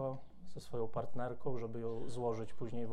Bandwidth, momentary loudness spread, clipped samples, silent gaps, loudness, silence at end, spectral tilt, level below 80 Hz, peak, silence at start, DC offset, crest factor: 12.5 kHz; 9 LU; under 0.1%; none; -42 LUFS; 0 s; -7.5 dB/octave; -62 dBFS; -24 dBFS; 0 s; under 0.1%; 12 dB